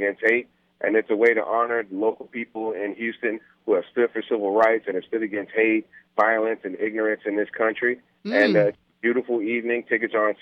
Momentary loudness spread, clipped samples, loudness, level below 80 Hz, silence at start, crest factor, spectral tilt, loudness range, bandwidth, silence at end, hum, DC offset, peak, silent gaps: 9 LU; under 0.1%; -23 LUFS; -76 dBFS; 0 s; 18 dB; -7 dB/octave; 2 LU; 6.6 kHz; 0.05 s; none; under 0.1%; -4 dBFS; none